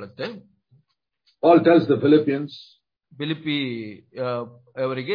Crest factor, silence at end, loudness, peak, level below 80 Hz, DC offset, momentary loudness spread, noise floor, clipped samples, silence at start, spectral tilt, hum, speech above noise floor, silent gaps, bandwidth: 18 dB; 0 s; -21 LUFS; -4 dBFS; -70 dBFS; under 0.1%; 18 LU; -68 dBFS; under 0.1%; 0 s; -9 dB/octave; none; 47 dB; none; 5.2 kHz